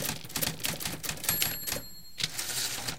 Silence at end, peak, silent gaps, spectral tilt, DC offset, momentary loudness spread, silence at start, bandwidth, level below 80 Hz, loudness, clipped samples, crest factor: 0 s; -8 dBFS; none; -1.5 dB/octave; 0.6%; 6 LU; 0 s; 17 kHz; -54 dBFS; -31 LUFS; under 0.1%; 26 dB